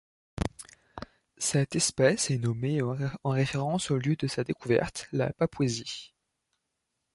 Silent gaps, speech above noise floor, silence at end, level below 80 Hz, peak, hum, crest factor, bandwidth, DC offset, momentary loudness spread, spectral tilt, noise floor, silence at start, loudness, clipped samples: none; 54 dB; 1.05 s; -52 dBFS; -10 dBFS; none; 20 dB; 11.5 kHz; under 0.1%; 20 LU; -5 dB/octave; -82 dBFS; 0.35 s; -29 LUFS; under 0.1%